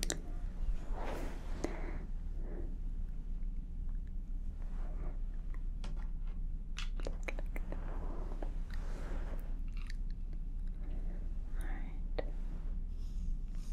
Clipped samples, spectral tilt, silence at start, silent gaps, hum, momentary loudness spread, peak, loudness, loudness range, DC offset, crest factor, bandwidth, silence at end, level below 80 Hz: under 0.1%; -5 dB/octave; 0 s; none; none; 3 LU; -14 dBFS; -45 LUFS; 1 LU; under 0.1%; 24 dB; 10 kHz; 0 s; -38 dBFS